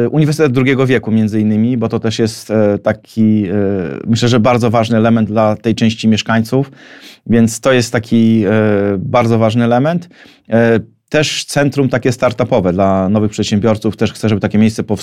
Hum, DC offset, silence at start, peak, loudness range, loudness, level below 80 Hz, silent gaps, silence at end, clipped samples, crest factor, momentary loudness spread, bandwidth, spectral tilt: none; under 0.1%; 0 s; 0 dBFS; 1 LU; -13 LUFS; -46 dBFS; none; 0 s; under 0.1%; 12 dB; 5 LU; 13.5 kHz; -6.5 dB/octave